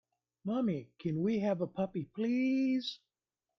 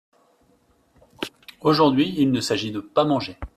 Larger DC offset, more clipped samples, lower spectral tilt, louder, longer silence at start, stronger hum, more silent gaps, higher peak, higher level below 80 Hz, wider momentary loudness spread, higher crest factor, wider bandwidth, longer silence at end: neither; neither; first, -7.5 dB/octave vs -5.5 dB/octave; second, -34 LUFS vs -21 LUFS; second, 0.45 s vs 1.2 s; neither; neither; second, -20 dBFS vs -4 dBFS; second, -74 dBFS vs -50 dBFS; second, 9 LU vs 16 LU; second, 14 dB vs 20 dB; second, 6.4 kHz vs 13.5 kHz; first, 0.65 s vs 0.1 s